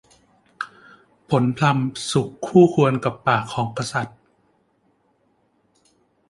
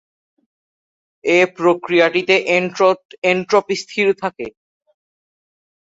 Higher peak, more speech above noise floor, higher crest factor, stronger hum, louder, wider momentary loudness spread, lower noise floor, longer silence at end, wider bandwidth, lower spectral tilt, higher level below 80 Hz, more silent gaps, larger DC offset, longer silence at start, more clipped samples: about the same, -2 dBFS vs -2 dBFS; second, 45 dB vs over 74 dB; about the same, 20 dB vs 18 dB; neither; second, -20 LUFS vs -16 LUFS; first, 18 LU vs 10 LU; second, -65 dBFS vs under -90 dBFS; first, 2.2 s vs 1.35 s; first, 11.5 kHz vs 7.8 kHz; first, -6 dB/octave vs -4.5 dB/octave; about the same, -60 dBFS vs -64 dBFS; second, none vs 3.05-3.09 s, 3.18-3.22 s; neither; second, 0.6 s vs 1.25 s; neither